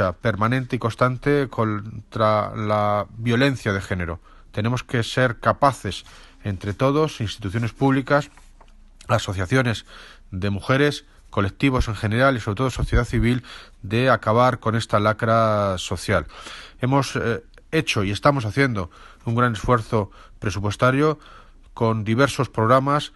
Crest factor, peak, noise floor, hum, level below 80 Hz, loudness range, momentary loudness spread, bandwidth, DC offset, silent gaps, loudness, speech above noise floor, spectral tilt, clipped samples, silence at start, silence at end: 20 dB; -2 dBFS; -47 dBFS; none; -38 dBFS; 3 LU; 12 LU; 12.5 kHz; under 0.1%; none; -22 LUFS; 26 dB; -6 dB/octave; under 0.1%; 0 s; 0.1 s